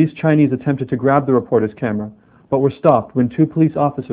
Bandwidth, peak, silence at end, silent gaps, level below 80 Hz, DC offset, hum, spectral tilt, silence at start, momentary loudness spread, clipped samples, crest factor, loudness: 4 kHz; 0 dBFS; 0 s; none; -52 dBFS; under 0.1%; none; -12.5 dB/octave; 0 s; 8 LU; under 0.1%; 16 dB; -17 LUFS